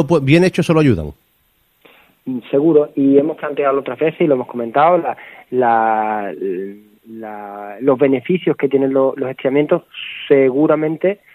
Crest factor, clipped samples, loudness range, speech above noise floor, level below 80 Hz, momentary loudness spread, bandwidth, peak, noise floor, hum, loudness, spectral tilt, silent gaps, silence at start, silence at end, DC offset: 16 dB; under 0.1%; 3 LU; 44 dB; -48 dBFS; 15 LU; 13.5 kHz; 0 dBFS; -60 dBFS; none; -16 LUFS; -7.5 dB/octave; none; 0 s; 0.2 s; under 0.1%